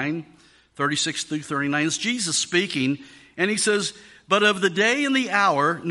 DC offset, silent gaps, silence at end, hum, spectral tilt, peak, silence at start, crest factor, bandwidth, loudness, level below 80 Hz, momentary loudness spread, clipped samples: under 0.1%; none; 0 s; none; -3 dB/octave; -4 dBFS; 0 s; 18 dB; 11.5 kHz; -22 LUFS; -68 dBFS; 9 LU; under 0.1%